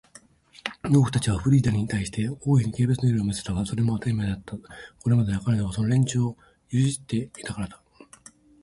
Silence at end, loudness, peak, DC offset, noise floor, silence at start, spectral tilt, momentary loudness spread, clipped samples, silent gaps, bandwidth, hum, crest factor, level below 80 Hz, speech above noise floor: 0.9 s; -25 LUFS; -8 dBFS; under 0.1%; -54 dBFS; 0.65 s; -6.5 dB/octave; 13 LU; under 0.1%; none; 11.5 kHz; none; 16 dB; -46 dBFS; 30 dB